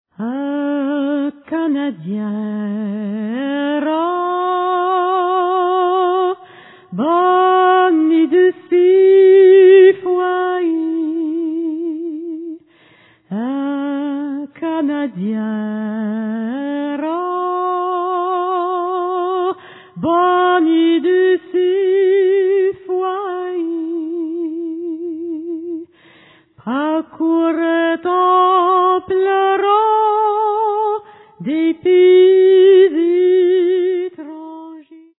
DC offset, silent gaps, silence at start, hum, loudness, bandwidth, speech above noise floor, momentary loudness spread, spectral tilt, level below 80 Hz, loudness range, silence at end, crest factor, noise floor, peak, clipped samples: under 0.1%; none; 0.2 s; none; -15 LUFS; 4 kHz; 30 dB; 15 LU; -10 dB/octave; -70 dBFS; 11 LU; 0.2 s; 14 dB; -50 dBFS; -2 dBFS; under 0.1%